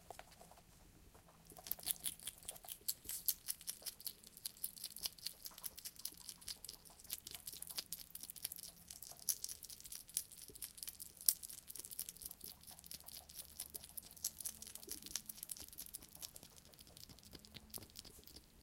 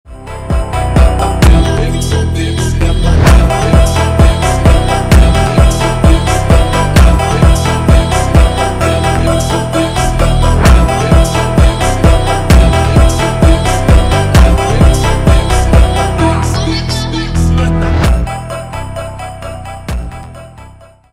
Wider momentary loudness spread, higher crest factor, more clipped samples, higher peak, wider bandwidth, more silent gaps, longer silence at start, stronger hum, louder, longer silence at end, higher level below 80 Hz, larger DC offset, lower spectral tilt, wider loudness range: first, 17 LU vs 13 LU; first, 40 dB vs 8 dB; second, under 0.1% vs 0.4%; second, -10 dBFS vs 0 dBFS; about the same, 17 kHz vs 15.5 kHz; neither; about the same, 0 s vs 0.1 s; neither; second, -46 LUFS vs -10 LUFS; second, 0 s vs 0.45 s; second, -72 dBFS vs -12 dBFS; neither; second, 0 dB/octave vs -5.5 dB/octave; about the same, 6 LU vs 5 LU